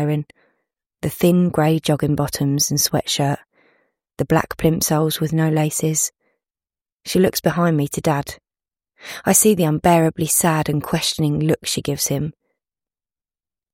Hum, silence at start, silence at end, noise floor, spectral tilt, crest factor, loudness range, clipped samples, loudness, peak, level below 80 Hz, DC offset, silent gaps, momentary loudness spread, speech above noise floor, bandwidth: none; 0 s; 1.4 s; under -90 dBFS; -4.5 dB/octave; 20 dB; 4 LU; under 0.1%; -18 LUFS; 0 dBFS; -48 dBFS; under 0.1%; 0.86-0.90 s, 6.92-6.99 s; 10 LU; over 72 dB; 16.5 kHz